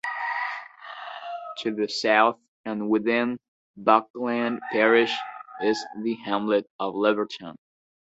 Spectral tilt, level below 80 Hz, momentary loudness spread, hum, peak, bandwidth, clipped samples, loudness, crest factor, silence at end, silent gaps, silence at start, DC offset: -4.5 dB/octave; -72 dBFS; 17 LU; none; -2 dBFS; 8.2 kHz; under 0.1%; -25 LUFS; 24 dB; 0.55 s; 2.48-2.64 s, 3.48-3.74 s, 4.10-4.14 s, 6.70-6.79 s; 0.05 s; under 0.1%